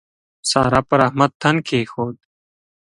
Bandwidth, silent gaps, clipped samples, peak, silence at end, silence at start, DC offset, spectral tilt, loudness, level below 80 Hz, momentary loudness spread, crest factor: 11.5 kHz; 1.35-1.40 s; under 0.1%; 0 dBFS; 0.75 s; 0.45 s; under 0.1%; -5 dB/octave; -18 LUFS; -46 dBFS; 10 LU; 20 dB